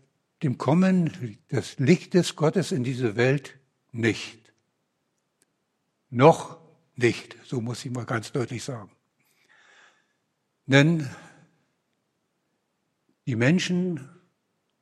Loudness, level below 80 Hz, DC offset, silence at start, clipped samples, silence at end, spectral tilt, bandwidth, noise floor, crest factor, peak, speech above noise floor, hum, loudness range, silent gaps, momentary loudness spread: -24 LUFS; -70 dBFS; under 0.1%; 0.4 s; under 0.1%; 0.75 s; -6 dB/octave; 12.5 kHz; -76 dBFS; 24 dB; -2 dBFS; 52 dB; none; 7 LU; none; 17 LU